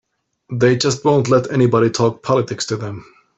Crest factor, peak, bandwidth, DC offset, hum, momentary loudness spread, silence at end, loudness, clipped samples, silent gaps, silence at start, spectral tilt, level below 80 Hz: 14 dB; -2 dBFS; 8.2 kHz; under 0.1%; none; 12 LU; 0.35 s; -16 LUFS; under 0.1%; none; 0.5 s; -5.5 dB/octave; -54 dBFS